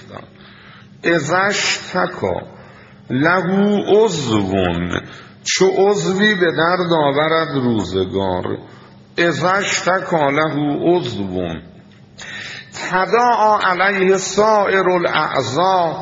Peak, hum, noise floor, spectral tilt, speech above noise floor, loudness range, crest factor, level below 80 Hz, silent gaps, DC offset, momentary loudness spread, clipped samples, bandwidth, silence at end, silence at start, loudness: 0 dBFS; none; -43 dBFS; -3.5 dB/octave; 26 dB; 4 LU; 16 dB; -54 dBFS; none; under 0.1%; 13 LU; under 0.1%; 7.8 kHz; 0 s; 0 s; -16 LUFS